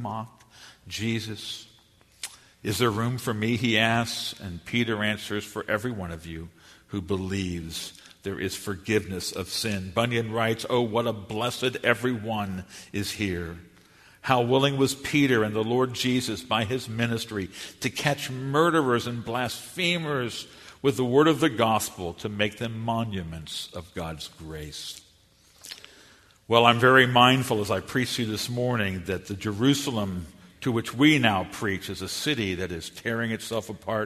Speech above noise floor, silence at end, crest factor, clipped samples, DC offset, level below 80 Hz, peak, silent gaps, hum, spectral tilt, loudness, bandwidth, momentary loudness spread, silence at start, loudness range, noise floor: 33 dB; 0 s; 26 dB; under 0.1%; under 0.1%; -56 dBFS; -2 dBFS; none; none; -4.5 dB/octave; -26 LUFS; 13.5 kHz; 16 LU; 0 s; 9 LU; -59 dBFS